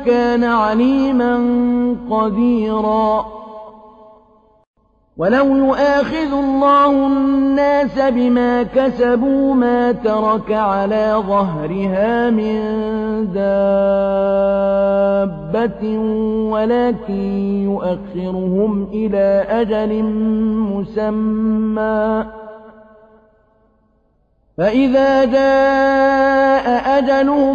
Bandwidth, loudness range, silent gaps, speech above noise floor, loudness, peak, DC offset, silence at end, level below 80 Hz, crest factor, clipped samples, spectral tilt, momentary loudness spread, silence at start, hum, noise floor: 7 kHz; 5 LU; 4.67-4.74 s; 44 dB; -16 LUFS; -4 dBFS; under 0.1%; 0 s; -42 dBFS; 12 dB; under 0.1%; -8 dB/octave; 7 LU; 0 s; none; -59 dBFS